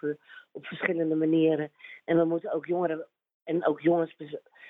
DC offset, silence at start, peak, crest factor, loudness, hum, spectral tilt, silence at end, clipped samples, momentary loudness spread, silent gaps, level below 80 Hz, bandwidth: under 0.1%; 0.05 s; -8 dBFS; 20 dB; -28 LUFS; none; -10 dB/octave; 0 s; under 0.1%; 18 LU; 3.34-3.40 s; -80 dBFS; 4 kHz